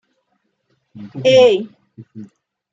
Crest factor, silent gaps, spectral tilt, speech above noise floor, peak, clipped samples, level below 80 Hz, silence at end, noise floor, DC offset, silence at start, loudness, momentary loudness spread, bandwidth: 16 dB; none; -5 dB/octave; 53 dB; -2 dBFS; under 0.1%; -64 dBFS; 0.5 s; -68 dBFS; under 0.1%; 0.95 s; -13 LUFS; 27 LU; 7.6 kHz